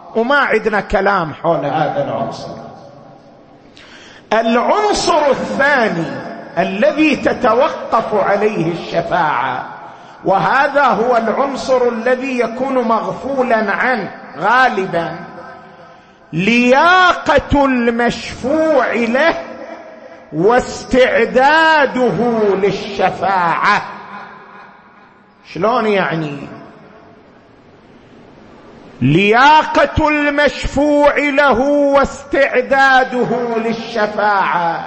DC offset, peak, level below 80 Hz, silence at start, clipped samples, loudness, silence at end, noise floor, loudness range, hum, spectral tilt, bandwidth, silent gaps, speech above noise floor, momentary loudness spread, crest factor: under 0.1%; 0 dBFS; -40 dBFS; 0.05 s; under 0.1%; -14 LUFS; 0 s; -45 dBFS; 7 LU; none; -5 dB/octave; 8.8 kHz; none; 31 dB; 13 LU; 14 dB